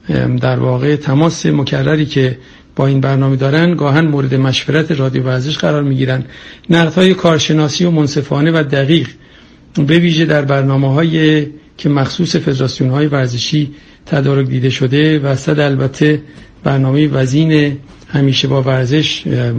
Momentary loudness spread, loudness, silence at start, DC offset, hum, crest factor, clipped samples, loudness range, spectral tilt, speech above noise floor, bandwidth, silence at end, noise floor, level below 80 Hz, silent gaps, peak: 6 LU; -13 LUFS; 0.05 s; under 0.1%; none; 12 dB; under 0.1%; 2 LU; -6.5 dB/octave; 29 dB; 8.4 kHz; 0 s; -41 dBFS; -44 dBFS; none; 0 dBFS